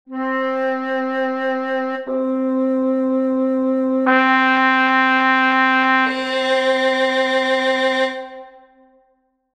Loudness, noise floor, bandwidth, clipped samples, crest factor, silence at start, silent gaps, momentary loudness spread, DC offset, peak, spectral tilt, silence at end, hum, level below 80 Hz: -17 LUFS; -63 dBFS; 9.2 kHz; under 0.1%; 16 dB; 0.1 s; none; 8 LU; under 0.1%; -2 dBFS; -3 dB/octave; 1.05 s; none; -66 dBFS